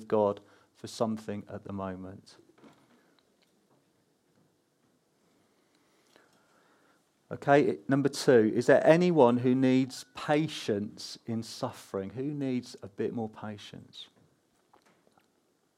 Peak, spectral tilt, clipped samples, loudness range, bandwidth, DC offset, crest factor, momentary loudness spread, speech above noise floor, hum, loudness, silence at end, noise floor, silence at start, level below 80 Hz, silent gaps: -6 dBFS; -6 dB/octave; under 0.1%; 17 LU; 14 kHz; under 0.1%; 24 dB; 22 LU; 44 dB; none; -28 LUFS; 1.75 s; -72 dBFS; 0 s; -78 dBFS; none